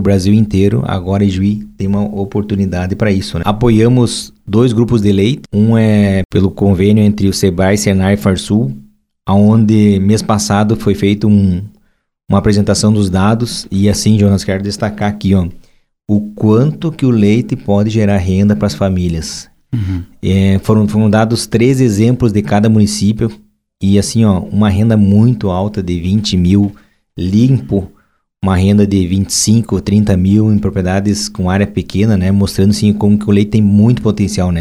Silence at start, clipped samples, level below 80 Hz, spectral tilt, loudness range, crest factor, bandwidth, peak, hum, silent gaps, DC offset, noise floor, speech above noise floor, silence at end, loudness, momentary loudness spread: 0 s; under 0.1%; -34 dBFS; -6.5 dB/octave; 2 LU; 12 dB; 13.5 kHz; 0 dBFS; none; 6.25-6.29 s; under 0.1%; -57 dBFS; 46 dB; 0 s; -12 LUFS; 7 LU